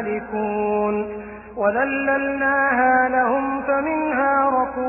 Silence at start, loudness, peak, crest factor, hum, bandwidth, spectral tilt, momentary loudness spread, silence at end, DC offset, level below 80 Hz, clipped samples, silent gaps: 0 s; -20 LUFS; -8 dBFS; 12 dB; none; 3 kHz; -10.5 dB/octave; 8 LU; 0 s; under 0.1%; -50 dBFS; under 0.1%; none